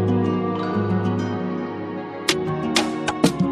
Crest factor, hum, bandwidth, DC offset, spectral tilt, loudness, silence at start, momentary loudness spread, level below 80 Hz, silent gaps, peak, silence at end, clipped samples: 18 dB; none; 13.5 kHz; under 0.1%; -5 dB/octave; -23 LUFS; 0 s; 7 LU; -52 dBFS; none; -4 dBFS; 0 s; under 0.1%